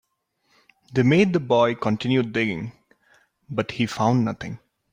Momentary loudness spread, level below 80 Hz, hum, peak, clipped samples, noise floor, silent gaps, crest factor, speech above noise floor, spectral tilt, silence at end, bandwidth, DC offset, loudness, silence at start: 15 LU; -58 dBFS; none; -6 dBFS; under 0.1%; -70 dBFS; none; 18 dB; 49 dB; -7 dB/octave; 0.35 s; 15.5 kHz; under 0.1%; -22 LUFS; 0.9 s